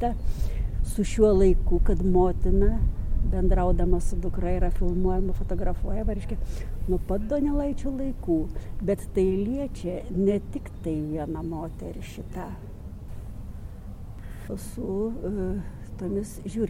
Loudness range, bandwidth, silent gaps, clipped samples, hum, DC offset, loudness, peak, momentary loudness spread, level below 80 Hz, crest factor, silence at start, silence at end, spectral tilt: 11 LU; 12.5 kHz; none; under 0.1%; none; under 0.1%; -28 LUFS; -8 dBFS; 17 LU; -28 dBFS; 18 dB; 0 s; 0 s; -8 dB/octave